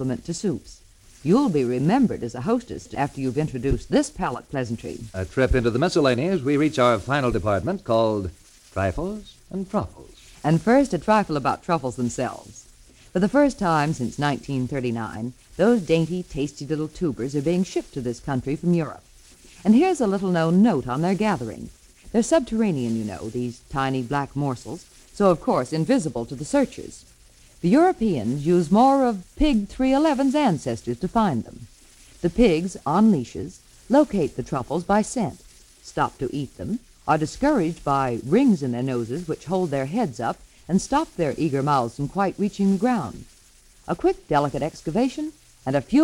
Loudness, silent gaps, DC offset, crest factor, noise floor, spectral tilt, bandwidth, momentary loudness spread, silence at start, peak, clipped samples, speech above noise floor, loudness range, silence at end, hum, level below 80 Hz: -23 LUFS; none; under 0.1%; 18 dB; -53 dBFS; -6.5 dB/octave; 15.5 kHz; 12 LU; 0 s; -6 dBFS; under 0.1%; 31 dB; 4 LU; 0 s; none; -42 dBFS